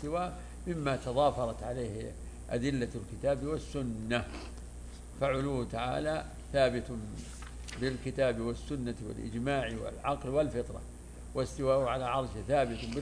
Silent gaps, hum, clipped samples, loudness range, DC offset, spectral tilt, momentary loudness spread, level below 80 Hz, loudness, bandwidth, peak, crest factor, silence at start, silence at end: none; none; under 0.1%; 2 LU; under 0.1%; -6 dB/octave; 14 LU; -46 dBFS; -34 LUFS; 11 kHz; -16 dBFS; 18 dB; 0 s; 0 s